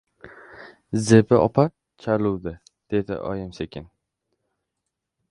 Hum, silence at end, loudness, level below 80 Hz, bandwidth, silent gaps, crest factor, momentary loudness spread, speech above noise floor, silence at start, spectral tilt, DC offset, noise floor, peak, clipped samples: none; 1.45 s; -22 LUFS; -50 dBFS; 11.5 kHz; none; 24 dB; 18 LU; 61 dB; 0.25 s; -7 dB/octave; under 0.1%; -82 dBFS; 0 dBFS; under 0.1%